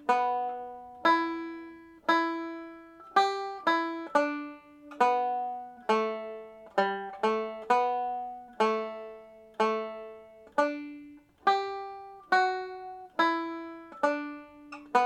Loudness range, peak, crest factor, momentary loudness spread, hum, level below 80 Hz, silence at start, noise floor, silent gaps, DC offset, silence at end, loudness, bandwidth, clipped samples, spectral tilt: 3 LU; -10 dBFS; 20 dB; 19 LU; none; -74 dBFS; 0 s; -51 dBFS; none; under 0.1%; 0 s; -30 LUFS; 11 kHz; under 0.1%; -4 dB/octave